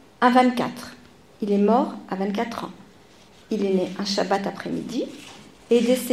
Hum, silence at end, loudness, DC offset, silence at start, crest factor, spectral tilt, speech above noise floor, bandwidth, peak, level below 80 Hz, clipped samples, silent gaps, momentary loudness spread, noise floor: none; 0 s; -23 LUFS; 0.1%; 0.2 s; 20 dB; -5.5 dB/octave; 29 dB; 15.5 kHz; -4 dBFS; -64 dBFS; under 0.1%; none; 16 LU; -51 dBFS